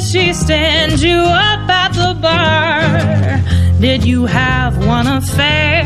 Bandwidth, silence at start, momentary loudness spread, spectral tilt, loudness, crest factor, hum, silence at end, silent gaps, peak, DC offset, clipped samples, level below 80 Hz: 13.5 kHz; 0 s; 3 LU; -5 dB/octave; -12 LUFS; 12 dB; none; 0 s; none; 0 dBFS; 0.9%; under 0.1%; -24 dBFS